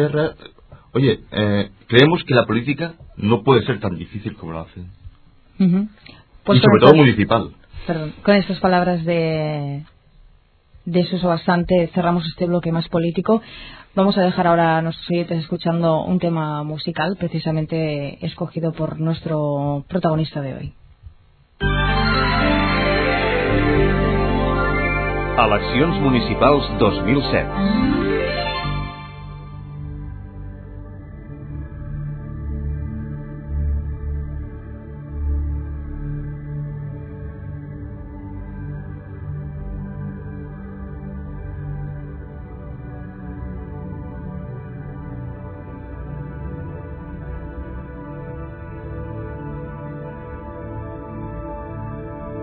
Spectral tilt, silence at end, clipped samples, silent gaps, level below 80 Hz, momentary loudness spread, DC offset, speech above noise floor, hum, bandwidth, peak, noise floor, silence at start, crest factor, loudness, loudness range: -9.5 dB/octave; 0 s; under 0.1%; none; -32 dBFS; 17 LU; under 0.1%; 34 dB; none; 6 kHz; 0 dBFS; -52 dBFS; 0 s; 20 dB; -20 LUFS; 16 LU